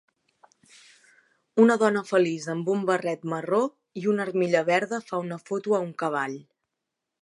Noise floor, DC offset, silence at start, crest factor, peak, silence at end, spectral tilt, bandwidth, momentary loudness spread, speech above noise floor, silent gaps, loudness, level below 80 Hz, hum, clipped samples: -84 dBFS; under 0.1%; 1.55 s; 20 dB; -6 dBFS; 0.8 s; -6 dB/octave; 11.5 kHz; 11 LU; 60 dB; none; -25 LUFS; -80 dBFS; none; under 0.1%